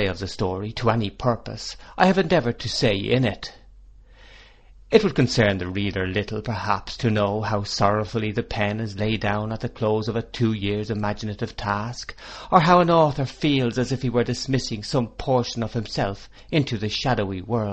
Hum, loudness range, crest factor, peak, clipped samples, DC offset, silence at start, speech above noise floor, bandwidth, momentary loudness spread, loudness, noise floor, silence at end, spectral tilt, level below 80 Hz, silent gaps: none; 4 LU; 22 dB; 0 dBFS; under 0.1%; under 0.1%; 0 s; 26 dB; 8.4 kHz; 9 LU; -23 LUFS; -48 dBFS; 0 s; -6 dB/octave; -44 dBFS; none